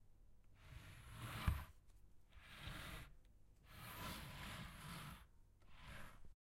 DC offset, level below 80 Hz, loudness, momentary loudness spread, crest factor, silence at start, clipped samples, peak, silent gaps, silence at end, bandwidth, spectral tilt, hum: under 0.1%; -58 dBFS; -53 LUFS; 19 LU; 28 dB; 0 s; under 0.1%; -26 dBFS; none; 0.15 s; 16.5 kHz; -4.5 dB/octave; none